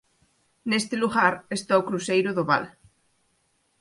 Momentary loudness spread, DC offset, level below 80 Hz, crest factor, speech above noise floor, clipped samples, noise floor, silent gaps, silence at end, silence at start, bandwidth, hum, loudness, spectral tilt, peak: 8 LU; under 0.1%; -66 dBFS; 22 dB; 46 dB; under 0.1%; -69 dBFS; none; 1.1 s; 0.65 s; 11.5 kHz; none; -24 LUFS; -4.5 dB/octave; -6 dBFS